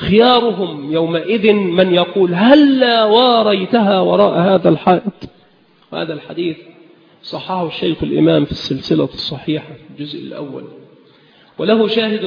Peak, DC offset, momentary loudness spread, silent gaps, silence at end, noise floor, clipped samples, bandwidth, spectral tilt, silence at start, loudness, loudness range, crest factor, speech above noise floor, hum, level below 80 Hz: 0 dBFS; under 0.1%; 17 LU; none; 0 s; -51 dBFS; under 0.1%; 5.4 kHz; -7.5 dB/octave; 0 s; -14 LUFS; 9 LU; 14 dB; 37 dB; none; -48 dBFS